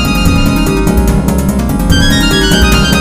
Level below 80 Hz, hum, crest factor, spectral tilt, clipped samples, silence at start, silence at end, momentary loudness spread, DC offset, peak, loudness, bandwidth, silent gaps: -14 dBFS; none; 8 dB; -5 dB/octave; 0.4%; 0 s; 0 s; 4 LU; 1%; 0 dBFS; -10 LUFS; 16 kHz; none